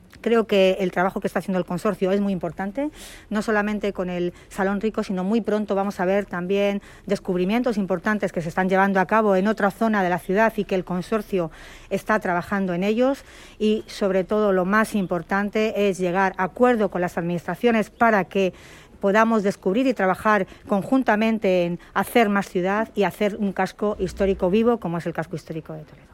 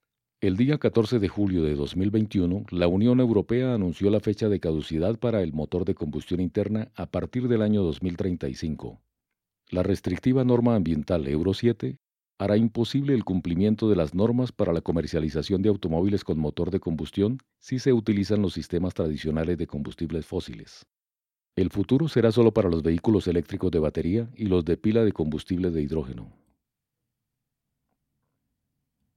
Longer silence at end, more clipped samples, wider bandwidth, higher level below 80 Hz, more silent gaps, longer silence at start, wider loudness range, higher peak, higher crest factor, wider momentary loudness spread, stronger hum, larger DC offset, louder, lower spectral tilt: second, 0.3 s vs 2.85 s; neither; first, 16 kHz vs 11.5 kHz; about the same, -50 dBFS vs -46 dBFS; neither; second, 0.15 s vs 0.4 s; about the same, 3 LU vs 5 LU; about the same, -4 dBFS vs -6 dBFS; about the same, 18 dB vs 18 dB; about the same, 8 LU vs 9 LU; neither; neither; first, -22 LUFS vs -25 LUFS; second, -6.5 dB/octave vs -8 dB/octave